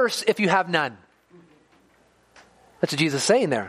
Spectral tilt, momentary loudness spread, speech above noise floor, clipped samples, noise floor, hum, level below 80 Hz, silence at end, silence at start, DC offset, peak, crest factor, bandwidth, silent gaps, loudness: -4 dB/octave; 8 LU; 38 dB; under 0.1%; -60 dBFS; none; -70 dBFS; 0 s; 0 s; under 0.1%; -4 dBFS; 20 dB; 15 kHz; none; -22 LUFS